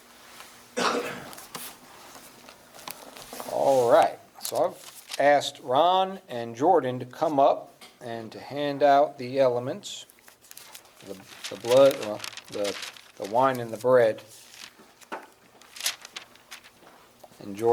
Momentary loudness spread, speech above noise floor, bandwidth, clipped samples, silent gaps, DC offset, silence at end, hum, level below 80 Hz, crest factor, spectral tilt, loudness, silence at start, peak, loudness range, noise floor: 25 LU; 30 dB; over 20 kHz; under 0.1%; none; under 0.1%; 0 s; none; -74 dBFS; 20 dB; -4 dB/octave; -25 LUFS; 0.35 s; -6 dBFS; 8 LU; -54 dBFS